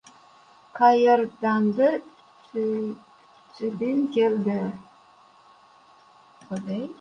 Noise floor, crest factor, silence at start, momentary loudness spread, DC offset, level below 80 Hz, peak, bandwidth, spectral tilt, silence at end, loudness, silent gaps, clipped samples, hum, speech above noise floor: -55 dBFS; 18 dB; 0.75 s; 16 LU; under 0.1%; -72 dBFS; -6 dBFS; 9.4 kHz; -7 dB/octave; 0.05 s; -24 LUFS; none; under 0.1%; none; 32 dB